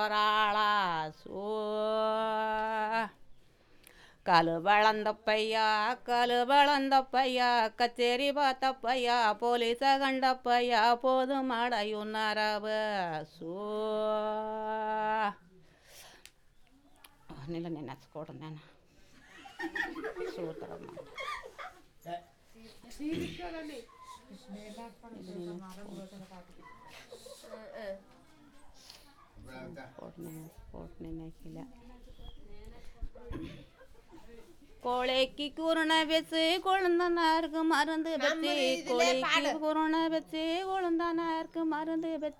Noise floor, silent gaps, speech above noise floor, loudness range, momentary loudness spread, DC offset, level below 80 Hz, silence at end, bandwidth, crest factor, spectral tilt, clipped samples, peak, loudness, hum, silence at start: -61 dBFS; none; 30 dB; 21 LU; 22 LU; under 0.1%; -60 dBFS; 0.05 s; 18.5 kHz; 20 dB; -4 dB/octave; under 0.1%; -12 dBFS; -30 LUFS; none; 0 s